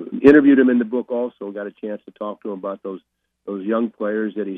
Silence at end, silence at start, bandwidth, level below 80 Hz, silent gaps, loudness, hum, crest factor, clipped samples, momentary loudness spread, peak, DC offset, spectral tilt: 0 s; 0 s; 4.7 kHz; -54 dBFS; none; -18 LUFS; none; 20 dB; under 0.1%; 20 LU; 0 dBFS; under 0.1%; -8.5 dB/octave